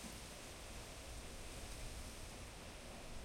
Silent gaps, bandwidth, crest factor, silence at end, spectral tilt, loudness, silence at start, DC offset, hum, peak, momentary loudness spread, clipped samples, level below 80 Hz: none; 16.5 kHz; 16 dB; 0 s; -3 dB/octave; -52 LUFS; 0 s; under 0.1%; none; -36 dBFS; 2 LU; under 0.1%; -54 dBFS